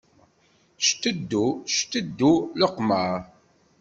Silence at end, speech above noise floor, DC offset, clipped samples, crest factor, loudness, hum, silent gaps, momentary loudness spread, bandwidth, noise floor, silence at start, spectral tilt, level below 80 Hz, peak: 0.55 s; 39 dB; under 0.1%; under 0.1%; 20 dB; -24 LUFS; none; none; 6 LU; 8 kHz; -62 dBFS; 0.8 s; -3.5 dB/octave; -62 dBFS; -6 dBFS